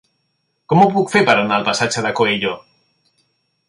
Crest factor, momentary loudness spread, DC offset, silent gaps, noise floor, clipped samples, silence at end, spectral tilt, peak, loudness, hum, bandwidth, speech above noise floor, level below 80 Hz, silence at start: 18 dB; 7 LU; under 0.1%; none; -69 dBFS; under 0.1%; 1.1 s; -4.5 dB/octave; 0 dBFS; -16 LUFS; none; 11.5 kHz; 54 dB; -58 dBFS; 0.7 s